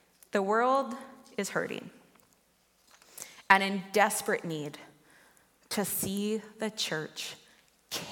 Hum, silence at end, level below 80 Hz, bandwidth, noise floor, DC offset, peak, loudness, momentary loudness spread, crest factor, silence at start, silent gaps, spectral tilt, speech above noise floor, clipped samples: none; 0 s; -74 dBFS; 17.5 kHz; -68 dBFS; under 0.1%; -4 dBFS; -30 LUFS; 21 LU; 30 dB; 0.35 s; none; -3 dB/octave; 38 dB; under 0.1%